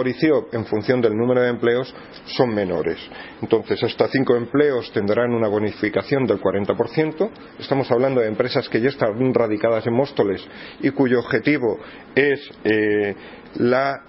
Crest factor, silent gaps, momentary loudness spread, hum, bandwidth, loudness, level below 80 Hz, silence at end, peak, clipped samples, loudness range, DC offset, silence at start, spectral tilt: 18 dB; none; 8 LU; none; 5.8 kHz; -20 LUFS; -56 dBFS; 0.05 s; -2 dBFS; under 0.1%; 1 LU; under 0.1%; 0 s; -10.5 dB/octave